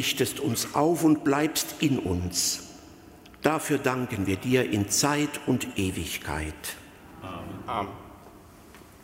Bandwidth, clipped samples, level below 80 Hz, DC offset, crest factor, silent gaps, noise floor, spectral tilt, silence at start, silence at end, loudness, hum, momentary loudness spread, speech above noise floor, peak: 16 kHz; under 0.1%; -50 dBFS; under 0.1%; 20 dB; none; -50 dBFS; -4 dB/octave; 0 s; 0.15 s; -27 LUFS; none; 15 LU; 23 dB; -8 dBFS